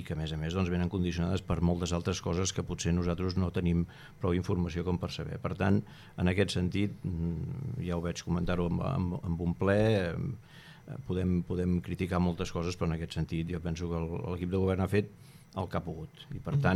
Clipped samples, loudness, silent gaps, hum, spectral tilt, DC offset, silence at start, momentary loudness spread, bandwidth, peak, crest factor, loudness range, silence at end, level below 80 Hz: under 0.1%; -32 LUFS; none; none; -6.5 dB/octave; under 0.1%; 0 s; 8 LU; 12.5 kHz; -14 dBFS; 18 dB; 2 LU; 0 s; -48 dBFS